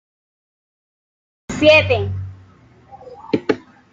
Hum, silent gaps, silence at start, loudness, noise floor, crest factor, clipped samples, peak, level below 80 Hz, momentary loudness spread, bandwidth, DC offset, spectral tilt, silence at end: none; none; 1.5 s; -16 LUFS; -48 dBFS; 20 dB; under 0.1%; -2 dBFS; -52 dBFS; 20 LU; 7.8 kHz; under 0.1%; -5.5 dB/octave; 0.35 s